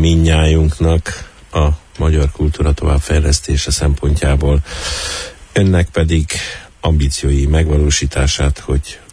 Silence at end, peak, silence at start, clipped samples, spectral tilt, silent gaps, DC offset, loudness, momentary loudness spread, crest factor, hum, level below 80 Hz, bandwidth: 0.15 s; -2 dBFS; 0 s; under 0.1%; -5 dB/octave; none; under 0.1%; -15 LUFS; 7 LU; 12 dB; none; -18 dBFS; 11 kHz